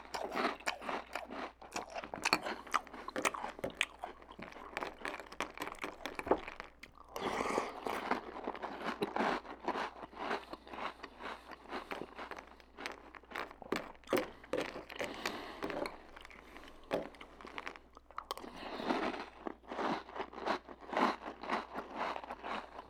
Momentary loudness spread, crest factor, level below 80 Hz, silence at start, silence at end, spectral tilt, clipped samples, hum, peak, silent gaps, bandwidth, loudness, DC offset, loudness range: 13 LU; 30 dB; -64 dBFS; 0 s; 0 s; -3 dB/octave; under 0.1%; none; -10 dBFS; none; over 20 kHz; -41 LUFS; under 0.1%; 6 LU